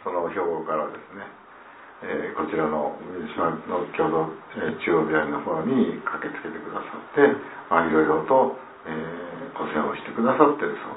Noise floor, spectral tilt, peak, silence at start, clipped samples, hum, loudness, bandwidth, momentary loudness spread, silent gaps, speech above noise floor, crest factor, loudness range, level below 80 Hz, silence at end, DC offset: -46 dBFS; -10.5 dB/octave; -2 dBFS; 0 s; under 0.1%; none; -25 LUFS; 4 kHz; 14 LU; none; 22 dB; 24 dB; 6 LU; -62 dBFS; 0 s; under 0.1%